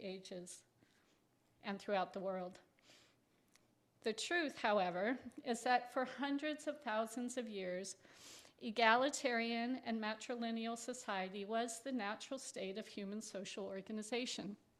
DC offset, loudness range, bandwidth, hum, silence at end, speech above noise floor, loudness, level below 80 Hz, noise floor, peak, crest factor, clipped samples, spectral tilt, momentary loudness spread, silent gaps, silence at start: under 0.1%; 8 LU; 14 kHz; none; 0.25 s; 35 dB; -41 LUFS; -86 dBFS; -76 dBFS; -16 dBFS; 26 dB; under 0.1%; -3.5 dB/octave; 13 LU; none; 0 s